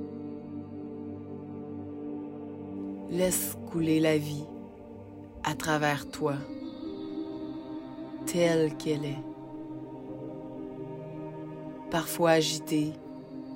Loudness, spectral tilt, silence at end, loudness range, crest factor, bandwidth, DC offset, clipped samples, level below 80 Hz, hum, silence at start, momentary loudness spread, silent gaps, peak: -32 LUFS; -4.5 dB/octave; 0 s; 5 LU; 22 dB; 16 kHz; under 0.1%; under 0.1%; -62 dBFS; none; 0 s; 16 LU; none; -10 dBFS